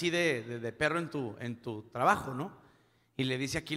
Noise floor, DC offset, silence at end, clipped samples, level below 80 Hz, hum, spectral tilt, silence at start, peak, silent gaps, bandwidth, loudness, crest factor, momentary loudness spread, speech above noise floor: -66 dBFS; under 0.1%; 0 s; under 0.1%; -62 dBFS; none; -4.5 dB/octave; 0 s; -12 dBFS; none; 16 kHz; -33 LUFS; 22 dB; 12 LU; 33 dB